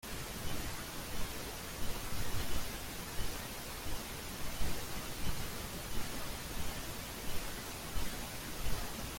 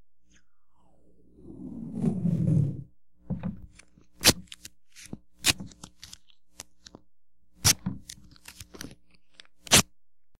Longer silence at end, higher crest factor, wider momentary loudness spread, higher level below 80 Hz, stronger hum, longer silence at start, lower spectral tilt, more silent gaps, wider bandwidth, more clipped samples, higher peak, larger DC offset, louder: about the same, 0 s vs 0.05 s; second, 16 dB vs 30 dB; second, 2 LU vs 26 LU; first, -46 dBFS vs -52 dBFS; neither; about the same, 0.05 s vs 0 s; about the same, -3 dB/octave vs -3 dB/octave; neither; about the same, 17 kHz vs 16 kHz; neither; second, -20 dBFS vs 0 dBFS; neither; second, -42 LUFS vs -25 LUFS